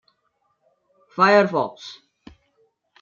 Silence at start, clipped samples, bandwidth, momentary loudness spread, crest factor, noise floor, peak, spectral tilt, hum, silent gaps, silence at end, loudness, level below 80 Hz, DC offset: 1.15 s; under 0.1%; 7.4 kHz; 24 LU; 22 dB; -70 dBFS; -2 dBFS; -5.5 dB/octave; none; none; 1.1 s; -18 LUFS; -68 dBFS; under 0.1%